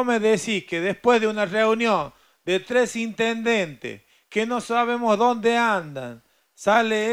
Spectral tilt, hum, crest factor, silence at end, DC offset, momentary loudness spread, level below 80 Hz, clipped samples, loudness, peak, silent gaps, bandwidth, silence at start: -4 dB/octave; none; 16 dB; 0 s; under 0.1%; 13 LU; -66 dBFS; under 0.1%; -22 LUFS; -6 dBFS; none; 15.5 kHz; 0 s